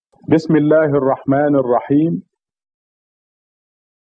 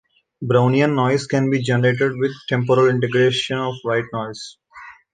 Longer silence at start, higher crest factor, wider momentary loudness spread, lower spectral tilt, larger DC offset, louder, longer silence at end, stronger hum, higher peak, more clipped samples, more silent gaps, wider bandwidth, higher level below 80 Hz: about the same, 0.3 s vs 0.4 s; about the same, 16 dB vs 16 dB; second, 4 LU vs 12 LU; first, -9.5 dB/octave vs -6.5 dB/octave; neither; first, -15 LUFS vs -19 LUFS; first, 1.9 s vs 0.2 s; neither; about the same, 0 dBFS vs -2 dBFS; neither; neither; second, 7.4 kHz vs 9.4 kHz; about the same, -58 dBFS vs -60 dBFS